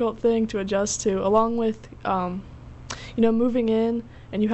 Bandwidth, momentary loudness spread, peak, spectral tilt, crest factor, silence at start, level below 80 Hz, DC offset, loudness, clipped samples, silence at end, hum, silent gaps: 8.2 kHz; 15 LU; -8 dBFS; -5.5 dB/octave; 16 dB; 0 s; -48 dBFS; under 0.1%; -24 LUFS; under 0.1%; 0 s; none; none